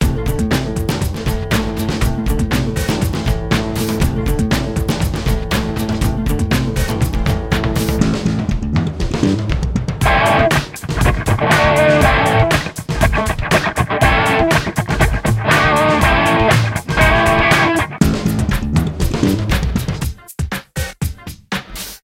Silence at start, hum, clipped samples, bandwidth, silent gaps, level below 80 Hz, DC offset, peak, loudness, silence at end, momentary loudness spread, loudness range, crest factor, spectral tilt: 0 s; none; under 0.1%; 17 kHz; none; -22 dBFS; under 0.1%; 0 dBFS; -16 LUFS; 0.05 s; 9 LU; 5 LU; 16 dB; -5.5 dB/octave